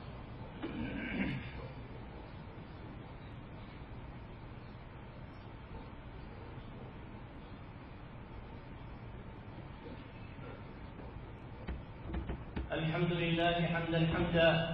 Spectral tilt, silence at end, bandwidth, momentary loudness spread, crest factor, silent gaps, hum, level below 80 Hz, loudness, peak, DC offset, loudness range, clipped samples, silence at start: -4.5 dB/octave; 0 s; 5.4 kHz; 18 LU; 22 dB; none; none; -52 dBFS; -40 LUFS; -16 dBFS; under 0.1%; 14 LU; under 0.1%; 0 s